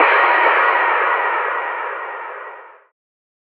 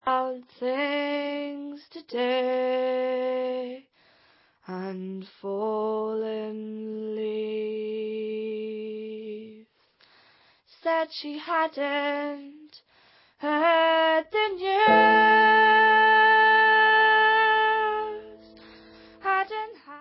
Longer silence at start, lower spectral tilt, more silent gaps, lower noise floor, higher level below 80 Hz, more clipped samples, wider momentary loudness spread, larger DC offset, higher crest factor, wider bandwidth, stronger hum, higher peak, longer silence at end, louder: about the same, 0 s vs 0.05 s; second, 5.5 dB/octave vs -8 dB/octave; neither; second, -37 dBFS vs -62 dBFS; second, under -90 dBFS vs -70 dBFS; neither; about the same, 18 LU vs 19 LU; neither; about the same, 18 dB vs 18 dB; second, 5.2 kHz vs 5.8 kHz; neither; first, 0 dBFS vs -6 dBFS; first, 0.75 s vs 0 s; first, -16 LUFS vs -23 LUFS